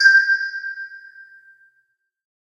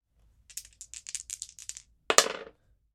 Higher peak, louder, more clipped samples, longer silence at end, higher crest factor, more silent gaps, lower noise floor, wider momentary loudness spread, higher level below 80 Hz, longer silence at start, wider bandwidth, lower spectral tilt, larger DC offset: about the same, -2 dBFS vs -2 dBFS; first, -17 LUFS vs -28 LUFS; neither; first, 1.5 s vs 0.5 s; second, 20 dB vs 32 dB; neither; first, -68 dBFS vs -63 dBFS; about the same, 23 LU vs 21 LU; second, under -90 dBFS vs -66 dBFS; second, 0 s vs 0.5 s; second, 10.5 kHz vs 16 kHz; second, 7 dB/octave vs 1 dB/octave; neither